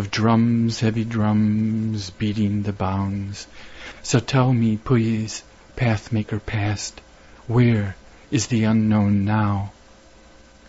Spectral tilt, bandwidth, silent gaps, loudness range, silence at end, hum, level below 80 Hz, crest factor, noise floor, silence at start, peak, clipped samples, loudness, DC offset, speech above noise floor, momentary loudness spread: -6.5 dB/octave; 8 kHz; none; 2 LU; 0.95 s; none; -46 dBFS; 16 dB; -48 dBFS; 0 s; -6 dBFS; under 0.1%; -21 LUFS; under 0.1%; 28 dB; 14 LU